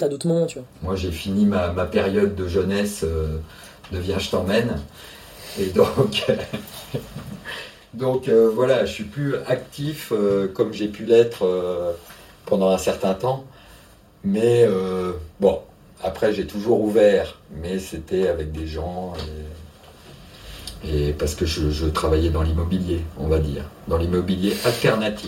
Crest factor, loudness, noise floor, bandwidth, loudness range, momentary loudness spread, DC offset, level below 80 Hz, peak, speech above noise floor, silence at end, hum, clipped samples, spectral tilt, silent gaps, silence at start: 20 dB; -22 LUFS; -49 dBFS; 16.5 kHz; 4 LU; 16 LU; under 0.1%; -36 dBFS; -2 dBFS; 28 dB; 0 s; none; under 0.1%; -6 dB/octave; none; 0 s